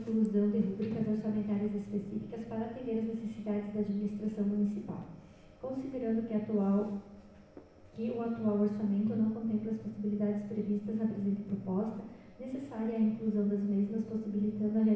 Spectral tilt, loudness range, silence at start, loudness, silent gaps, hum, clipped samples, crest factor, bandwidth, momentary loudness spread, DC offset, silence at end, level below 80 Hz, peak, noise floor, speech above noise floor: -10 dB/octave; 3 LU; 0 s; -34 LUFS; none; none; under 0.1%; 14 dB; 5.4 kHz; 10 LU; under 0.1%; 0 s; -64 dBFS; -20 dBFS; -55 dBFS; 22 dB